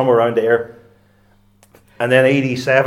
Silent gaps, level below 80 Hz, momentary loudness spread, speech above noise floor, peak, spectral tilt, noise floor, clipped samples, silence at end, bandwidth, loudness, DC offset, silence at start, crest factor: none; -62 dBFS; 9 LU; 39 dB; 0 dBFS; -6.5 dB/octave; -54 dBFS; under 0.1%; 0 s; 14.5 kHz; -15 LUFS; under 0.1%; 0 s; 16 dB